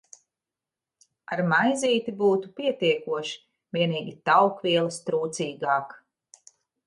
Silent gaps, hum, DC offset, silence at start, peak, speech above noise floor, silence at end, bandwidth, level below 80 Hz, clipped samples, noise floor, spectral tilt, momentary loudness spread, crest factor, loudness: none; none; under 0.1%; 1.3 s; -6 dBFS; 65 dB; 0.9 s; 11.5 kHz; -74 dBFS; under 0.1%; -89 dBFS; -4.5 dB/octave; 11 LU; 20 dB; -25 LUFS